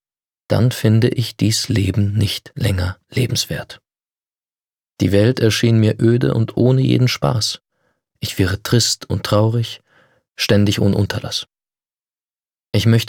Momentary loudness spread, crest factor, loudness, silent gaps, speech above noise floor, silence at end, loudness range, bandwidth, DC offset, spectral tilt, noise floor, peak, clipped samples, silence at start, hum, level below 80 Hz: 10 LU; 16 dB; -17 LUFS; none; over 74 dB; 0 s; 5 LU; 17 kHz; under 0.1%; -5.5 dB/octave; under -90 dBFS; -2 dBFS; under 0.1%; 0.5 s; none; -46 dBFS